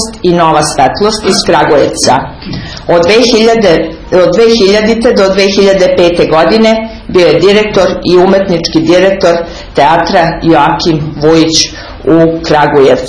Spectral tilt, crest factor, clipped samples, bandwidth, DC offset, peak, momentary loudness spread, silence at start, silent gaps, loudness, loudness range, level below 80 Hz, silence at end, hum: -4.5 dB/octave; 6 dB; 4%; 11 kHz; 0.4%; 0 dBFS; 6 LU; 0 s; none; -7 LUFS; 1 LU; -30 dBFS; 0 s; none